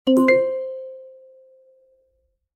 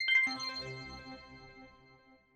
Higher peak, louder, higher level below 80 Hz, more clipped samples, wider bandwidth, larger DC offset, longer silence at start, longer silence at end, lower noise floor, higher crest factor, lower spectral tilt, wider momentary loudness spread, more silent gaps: first, -4 dBFS vs -20 dBFS; first, -19 LUFS vs -33 LUFS; about the same, -68 dBFS vs -64 dBFS; neither; about the same, 14 kHz vs 13.5 kHz; neither; about the same, 0.05 s vs 0 s; first, 1.45 s vs 0.65 s; first, -69 dBFS vs -63 dBFS; about the same, 18 dB vs 18 dB; first, -5 dB/octave vs -2 dB/octave; second, 23 LU vs 26 LU; neither